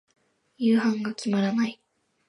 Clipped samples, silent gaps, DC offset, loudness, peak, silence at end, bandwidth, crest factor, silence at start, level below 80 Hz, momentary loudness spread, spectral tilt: under 0.1%; none; under 0.1%; -25 LUFS; -12 dBFS; 0.55 s; 11 kHz; 14 dB; 0.6 s; -76 dBFS; 6 LU; -6 dB/octave